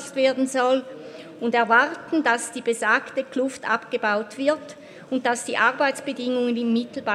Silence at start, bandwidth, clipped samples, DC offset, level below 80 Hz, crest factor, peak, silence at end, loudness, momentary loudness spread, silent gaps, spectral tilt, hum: 0 s; 14 kHz; under 0.1%; under 0.1%; -76 dBFS; 20 dB; -4 dBFS; 0 s; -23 LUFS; 10 LU; none; -3 dB/octave; none